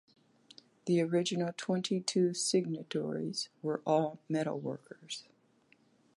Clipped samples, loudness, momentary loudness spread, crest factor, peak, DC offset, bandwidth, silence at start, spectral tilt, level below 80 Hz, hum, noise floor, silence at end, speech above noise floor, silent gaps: under 0.1%; -34 LUFS; 13 LU; 20 dB; -16 dBFS; under 0.1%; 11.5 kHz; 0.85 s; -5 dB/octave; -82 dBFS; none; -68 dBFS; 0.95 s; 35 dB; none